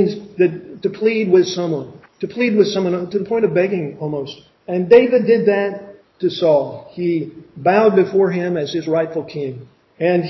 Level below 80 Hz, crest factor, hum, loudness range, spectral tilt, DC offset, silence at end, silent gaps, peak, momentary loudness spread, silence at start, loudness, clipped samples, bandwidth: -62 dBFS; 18 dB; none; 2 LU; -6.5 dB/octave; under 0.1%; 0 s; none; 0 dBFS; 14 LU; 0 s; -17 LUFS; under 0.1%; 6.2 kHz